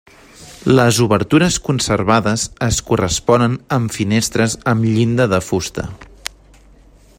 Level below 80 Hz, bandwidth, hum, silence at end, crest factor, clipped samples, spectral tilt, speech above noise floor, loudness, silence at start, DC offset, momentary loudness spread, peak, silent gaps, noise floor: -38 dBFS; 16.5 kHz; none; 1.15 s; 16 dB; under 0.1%; -5 dB/octave; 31 dB; -16 LUFS; 0.4 s; under 0.1%; 12 LU; 0 dBFS; none; -46 dBFS